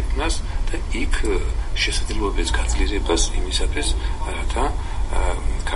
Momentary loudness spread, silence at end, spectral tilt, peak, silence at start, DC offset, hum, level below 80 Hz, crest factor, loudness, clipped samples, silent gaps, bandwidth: 6 LU; 0 s; -4 dB/octave; -4 dBFS; 0 s; under 0.1%; none; -22 dBFS; 14 dB; -24 LUFS; under 0.1%; none; 11.5 kHz